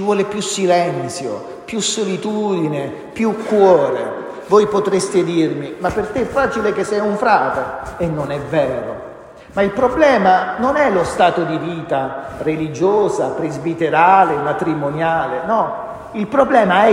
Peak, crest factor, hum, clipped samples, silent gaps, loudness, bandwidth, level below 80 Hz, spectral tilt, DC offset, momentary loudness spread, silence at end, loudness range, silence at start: 0 dBFS; 16 dB; none; under 0.1%; none; -17 LUFS; 15 kHz; -46 dBFS; -5 dB/octave; under 0.1%; 12 LU; 0 s; 3 LU; 0 s